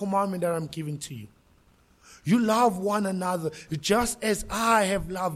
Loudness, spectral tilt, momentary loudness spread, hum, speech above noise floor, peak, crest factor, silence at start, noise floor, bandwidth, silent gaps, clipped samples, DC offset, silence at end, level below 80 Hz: -26 LUFS; -4.5 dB/octave; 12 LU; none; 35 dB; -8 dBFS; 18 dB; 0 s; -61 dBFS; 16 kHz; none; under 0.1%; under 0.1%; 0 s; -50 dBFS